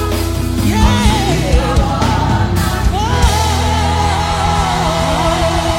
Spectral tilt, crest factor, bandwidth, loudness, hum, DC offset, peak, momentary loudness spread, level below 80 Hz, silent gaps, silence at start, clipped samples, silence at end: -5 dB/octave; 12 dB; 16.5 kHz; -14 LUFS; none; under 0.1%; 0 dBFS; 3 LU; -18 dBFS; none; 0 s; under 0.1%; 0 s